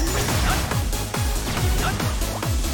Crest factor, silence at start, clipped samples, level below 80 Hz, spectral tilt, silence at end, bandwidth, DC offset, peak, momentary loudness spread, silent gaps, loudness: 14 dB; 0 s; under 0.1%; -26 dBFS; -4 dB/octave; 0 s; 17.5 kHz; under 0.1%; -8 dBFS; 3 LU; none; -23 LUFS